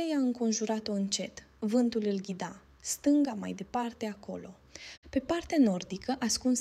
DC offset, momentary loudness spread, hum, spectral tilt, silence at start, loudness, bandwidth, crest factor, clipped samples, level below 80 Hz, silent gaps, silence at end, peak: under 0.1%; 15 LU; none; -4 dB/octave; 0 s; -31 LUFS; 15 kHz; 16 dB; under 0.1%; -60 dBFS; 4.97-5.03 s; 0 s; -14 dBFS